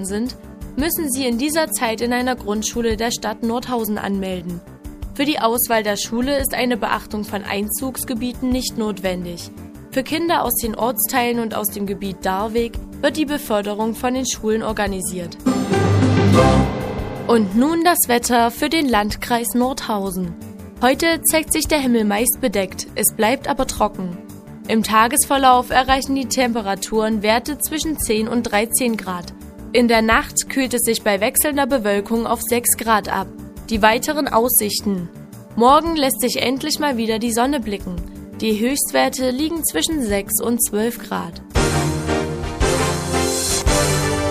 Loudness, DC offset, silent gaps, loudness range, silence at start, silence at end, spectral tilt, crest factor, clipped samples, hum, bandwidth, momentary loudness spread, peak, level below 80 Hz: -19 LUFS; under 0.1%; none; 4 LU; 0 s; 0 s; -4 dB/octave; 18 dB; under 0.1%; none; 15.5 kHz; 11 LU; 0 dBFS; -36 dBFS